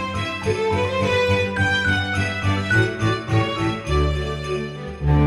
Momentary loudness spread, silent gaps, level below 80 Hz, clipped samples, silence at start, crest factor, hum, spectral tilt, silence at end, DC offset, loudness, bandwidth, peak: 7 LU; none; -32 dBFS; under 0.1%; 0 s; 16 dB; none; -6 dB/octave; 0 s; under 0.1%; -21 LUFS; 11.5 kHz; -6 dBFS